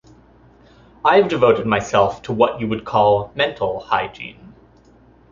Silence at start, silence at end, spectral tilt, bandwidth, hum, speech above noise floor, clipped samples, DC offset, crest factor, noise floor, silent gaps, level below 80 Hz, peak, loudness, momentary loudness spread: 1.05 s; 0.85 s; -5.5 dB/octave; 7.4 kHz; none; 33 dB; under 0.1%; under 0.1%; 18 dB; -50 dBFS; none; -50 dBFS; -2 dBFS; -18 LUFS; 10 LU